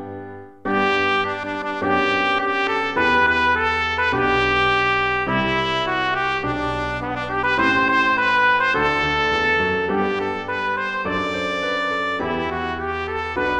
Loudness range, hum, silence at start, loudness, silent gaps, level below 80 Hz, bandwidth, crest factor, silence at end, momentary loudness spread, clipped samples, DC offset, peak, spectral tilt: 4 LU; none; 0 s; -19 LUFS; none; -42 dBFS; 10 kHz; 16 dB; 0 s; 8 LU; under 0.1%; 0.3%; -4 dBFS; -5 dB/octave